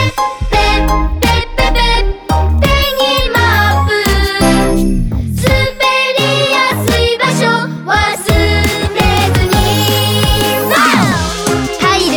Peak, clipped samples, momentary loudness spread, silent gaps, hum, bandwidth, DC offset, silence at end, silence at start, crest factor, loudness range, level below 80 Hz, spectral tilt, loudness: 0 dBFS; under 0.1%; 4 LU; none; none; over 20 kHz; under 0.1%; 0 s; 0 s; 12 dB; 1 LU; -20 dBFS; -4.5 dB/octave; -11 LUFS